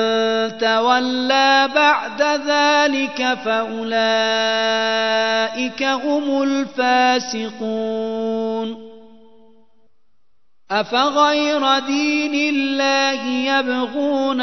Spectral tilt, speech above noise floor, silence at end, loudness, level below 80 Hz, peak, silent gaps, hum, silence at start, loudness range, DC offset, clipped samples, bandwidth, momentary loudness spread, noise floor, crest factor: -2.5 dB/octave; 54 dB; 0 s; -18 LUFS; -66 dBFS; -2 dBFS; none; none; 0 s; 7 LU; 0.4%; under 0.1%; 6.2 kHz; 8 LU; -72 dBFS; 18 dB